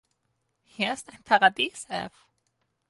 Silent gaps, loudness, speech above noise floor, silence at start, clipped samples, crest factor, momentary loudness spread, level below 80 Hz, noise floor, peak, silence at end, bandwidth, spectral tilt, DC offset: none; -26 LUFS; 50 dB; 0.8 s; under 0.1%; 22 dB; 15 LU; -70 dBFS; -76 dBFS; -6 dBFS; 0.8 s; 11.5 kHz; -2.5 dB/octave; under 0.1%